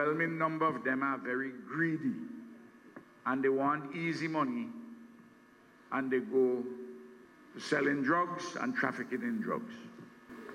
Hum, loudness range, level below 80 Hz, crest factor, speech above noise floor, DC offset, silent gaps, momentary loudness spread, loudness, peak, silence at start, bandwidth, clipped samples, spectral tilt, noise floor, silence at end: none; 2 LU; -82 dBFS; 20 dB; 27 dB; under 0.1%; none; 21 LU; -34 LUFS; -16 dBFS; 0 s; 12.5 kHz; under 0.1%; -6 dB/octave; -61 dBFS; 0 s